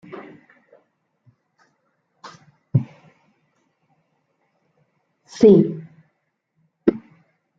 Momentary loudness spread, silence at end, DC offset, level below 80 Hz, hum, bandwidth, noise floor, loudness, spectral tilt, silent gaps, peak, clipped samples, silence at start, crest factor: 31 LU; 0.6 s; under 0.1%; -62 dBFS; none; 7.8 kHz; -73 dBFS; -18 LUFS; -9 dB/octave; none; -2 dBFS; under 0.1%; 0.15 s; 22 dB